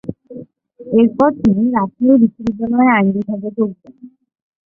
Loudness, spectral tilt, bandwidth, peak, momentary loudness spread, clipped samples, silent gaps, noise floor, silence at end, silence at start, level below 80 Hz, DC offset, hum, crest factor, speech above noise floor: -15 LUFS; -9.5 dB/octave; 3.6 kHz; -2 dBFS; 15 LU; under 0.1%; none; -37 dBFS; 0.6 s; 0.05 s; -50 dBFS; under 0.1%; none; 14 dB; 23 dB